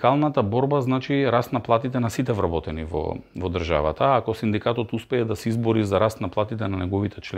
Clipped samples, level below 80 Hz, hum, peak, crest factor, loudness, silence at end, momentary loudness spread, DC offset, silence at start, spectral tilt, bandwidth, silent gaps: under 0.1%; -44 dBFS; none; -4 dBFS; 20 dB; -24 LUFS; 0 s; 7 LU; under 0.1%; 0 s; -7 dB/octave; 15.5 kHz; none